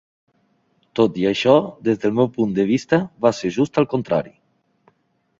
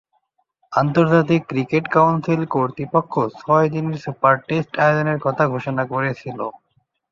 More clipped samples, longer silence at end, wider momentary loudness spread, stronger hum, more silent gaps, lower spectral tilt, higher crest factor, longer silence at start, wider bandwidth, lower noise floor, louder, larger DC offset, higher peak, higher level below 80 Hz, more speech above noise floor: neither; first, 1.1 s vs 0.55 s; about the same, 7 LU vs 9 LU; neither; neither; second, -6.5 dB/octave vs -8 dB/octave; about the same, 18 dB vs 18 dB; first, 0.95 s vs 0.7 s; about the same, 7.8 kHz vs 7.2 kHz; about the same, -66 dBFS vs -67 dBFS; about the same, -19 LUFS vs -19 LUFS; neither; about the same, -2 dBFS vs -2 dBFS; about the same, -58 dBFS vs -58 dBFS; about the same, 48 dB vs 49 dB